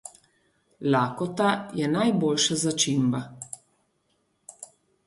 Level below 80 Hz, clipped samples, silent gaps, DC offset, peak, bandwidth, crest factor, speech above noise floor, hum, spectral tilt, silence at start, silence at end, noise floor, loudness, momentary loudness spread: -68 dBFS; under 0.1%; none; under 0.1%; -10 dBFS; 11.5 kHz; 18 dB; 47 dB; none; -4 dB/octave; 0.05 s; 0.4 s; -71 dBFS; -25 LUFS; 21 LU